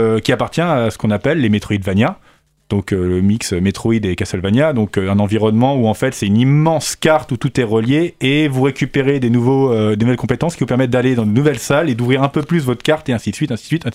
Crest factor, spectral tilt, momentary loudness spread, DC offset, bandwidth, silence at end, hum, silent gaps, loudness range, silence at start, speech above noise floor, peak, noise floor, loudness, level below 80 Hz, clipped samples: 14 dB; -6.5 dB/octave; 5 LU; under 0.1%; 16 kHz; 0 s; none; none; 2 LU; 0 s; 30 dB; -2 dBFS; -45 dBFS; -15 LUFS; -44 dBFS; under 0.1%